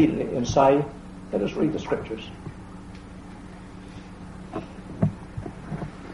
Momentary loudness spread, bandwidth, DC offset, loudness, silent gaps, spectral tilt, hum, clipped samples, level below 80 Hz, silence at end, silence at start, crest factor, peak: 22 LU; 11.5 kHz; under 0.1%; -26 LUFS; none; -7 dB/octave; none; under 0.1%; -46 dBFS; 0 s; 0 s; 22 dB; -6 dBFS